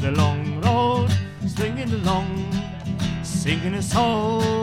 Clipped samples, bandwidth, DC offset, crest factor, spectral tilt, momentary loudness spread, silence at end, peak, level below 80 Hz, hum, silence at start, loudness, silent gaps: under 0.1%; 15 kHz; under 0.1%; 16 dB; -6 dB/octave; 7 LU; 0 s; -6 dBFS; -40 dBFS; none; 0 s; -23 LUFS; none